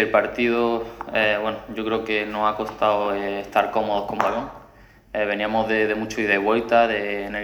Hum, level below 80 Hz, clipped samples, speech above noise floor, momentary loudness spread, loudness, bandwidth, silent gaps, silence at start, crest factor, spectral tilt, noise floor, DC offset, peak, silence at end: none; -50 dBFS; under 0.1%; 27 dB; 8 LU; -22 LUFS; over 20 kHz; none; 0 s; 22 dB; -5 dB/octave; -50 dBFS; under 0.1%; 0 dBFS; 0 s